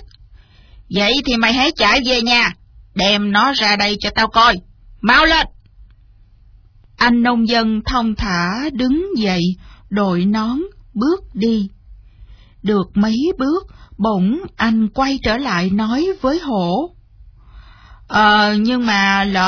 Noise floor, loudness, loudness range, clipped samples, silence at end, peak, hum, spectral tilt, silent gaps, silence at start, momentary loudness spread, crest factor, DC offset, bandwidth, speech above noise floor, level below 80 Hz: -47 dBFS; -15 LUFS; 6 LU; under 0.1%; 0 s; 0 dBFS; none; -5 dB/octave; none; 0 s; 9 LU; 16 dB; under 0.1%; 5.4 kHz; 31 dB; -38 dBFS